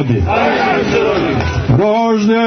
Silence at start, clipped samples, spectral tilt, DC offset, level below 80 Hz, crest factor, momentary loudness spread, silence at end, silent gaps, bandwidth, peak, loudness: 0 s; under 0.1%; -7 dB/octave; under 0.1%; -30 dBFS; 10 dB; 3 LU; 0 s; none; 6.6 kHz; -2 dBFS; -13 LUFS